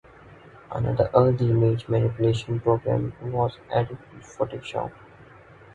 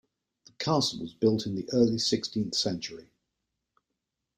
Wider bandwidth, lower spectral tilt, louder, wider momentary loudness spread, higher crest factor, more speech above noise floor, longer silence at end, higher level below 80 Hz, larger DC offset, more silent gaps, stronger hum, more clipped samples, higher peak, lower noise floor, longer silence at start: second, 8.6 kHz vs 15.5 kHz; first, -8.5 dB/octave vs -5 dB/octave; first, -24 LUFS vs -28 LUFS; about the same, 13 LU vs 11 LU; about the same, 22 dB vs 18 dB; second, 25 dB vs 57 dB; second, 0.5 s vs 1.35 s; first, -48 dBFS vs -64 dBFS; neither; neither; neither; neither; first, -2 dBFS vs -12 dBFS; second, -49 dBFS vs -85 dBFS; second, 0.25 s vs 0.6 s